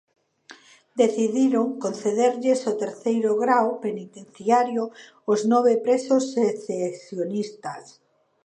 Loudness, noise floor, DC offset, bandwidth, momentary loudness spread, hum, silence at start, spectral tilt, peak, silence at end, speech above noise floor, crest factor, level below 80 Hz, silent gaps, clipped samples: -23 LUFS; -51 dBFS; under 0.1%; 9.8 kHz; 14 LU; none; 0.5 s; -5.5 dB/octave; -6 dBFS; 0.6 s; 28 dB; 18 dB; -78 dBFS; none; under 0.1%